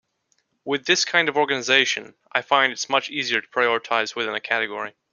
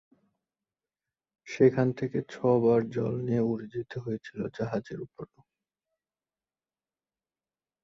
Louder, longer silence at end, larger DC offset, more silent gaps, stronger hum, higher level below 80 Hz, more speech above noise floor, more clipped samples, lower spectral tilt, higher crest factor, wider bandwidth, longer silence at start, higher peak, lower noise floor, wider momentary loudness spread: first, -21 LUFS vs -29 LUFS; second, 0.2 s vs 2.6 s; neither; neither; neither; second, -72 dBFS vs -66 dBFS; second, 47 dB vs over 62 dB; neither; second, -1.5 dB/octave vs -8.5 dB/octave; about the same, 22 dB vs 22 dB; first, 10 kHz vs 7.4 kHz; second, 0.65 s vs 1.45 s; first, -2 dBFS vs -8 dBFS; second, -70 dBFS vs under -90 dBFS; second, 10 LU vs 18 LU